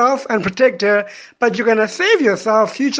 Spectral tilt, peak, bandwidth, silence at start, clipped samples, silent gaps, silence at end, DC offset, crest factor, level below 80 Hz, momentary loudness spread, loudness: -4 dB/octave; 0 dBFS; 9.4 kHz; 0 s; under 0.1%; none; 0 s; under 0.1%; 14 dB; -58 dBFS; 6 LU; -15 LUFS